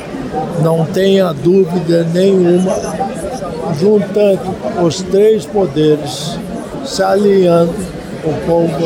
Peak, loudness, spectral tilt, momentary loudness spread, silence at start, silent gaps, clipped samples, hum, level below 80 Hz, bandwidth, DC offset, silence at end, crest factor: 0 dBFS; -13 LUFS; -6.5 dB/octave; 11 LU; 0 s; none; under 0.1%; none; -40 dBFS; 16 kHz; under 0.1%; 0 s; 12 dB